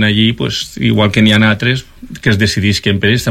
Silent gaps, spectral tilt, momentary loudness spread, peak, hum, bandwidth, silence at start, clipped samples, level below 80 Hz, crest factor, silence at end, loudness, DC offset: none; -5 dB/octave; 9 LU; 0 dBFS; none; 15.5 kHz; 0 s; under 0.1%; -38 dBFS; 12 dB; 0 s; -12 LUFS; under 0.1%